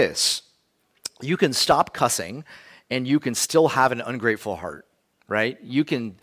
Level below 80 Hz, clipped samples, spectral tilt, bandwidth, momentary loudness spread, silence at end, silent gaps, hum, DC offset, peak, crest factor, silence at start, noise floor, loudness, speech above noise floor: -58 dBFS; under 0.1%; -3.5 dB/octave; 16 kHz; 14 LU; 0.1 s; none; none; under 0.1%; -6 dBFS; 18 dB; 0 s; -67 dBFS; -22 LUFS; 44 dB